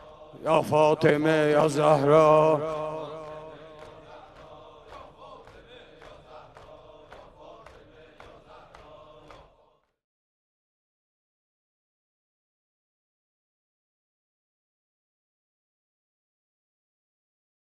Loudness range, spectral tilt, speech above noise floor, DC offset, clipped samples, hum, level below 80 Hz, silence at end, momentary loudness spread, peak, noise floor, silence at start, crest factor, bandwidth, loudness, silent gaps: 27 LU; -6.5 dB/octave; 44 dB; under 0.1%; under 0.1%; none; -62 dBFS; 10.5 s; 28 LU; -8 dBFS; -65 dBFS; 0.35 s; 22 dB; 13 kHz; -22 LUFS; none